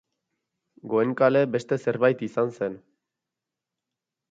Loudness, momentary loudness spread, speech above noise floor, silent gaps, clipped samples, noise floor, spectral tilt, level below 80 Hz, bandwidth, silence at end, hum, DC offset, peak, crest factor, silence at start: -24 LUFS; 11 LU; 63 dB; none; under 0.1%; -87 dBFS; -7.5 dB/octave; -72 dBFS; 7.8 kHz; 1.5 s; none; under 0.1%; -6 dBFS; 20 dB; 0.85 s